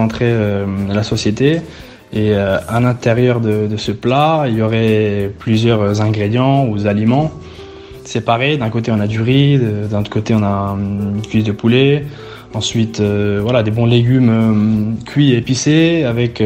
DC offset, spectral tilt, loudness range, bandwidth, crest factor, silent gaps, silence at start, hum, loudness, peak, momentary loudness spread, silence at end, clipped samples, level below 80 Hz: under 0.1%; -6.5 dB/octave; 2 LU; 10.5 kHz; 14 dB; none; 0 s; none; -14 LUFS; 0 dBFS; 8 LU; 0 s; under 0.1%; -42 dBFS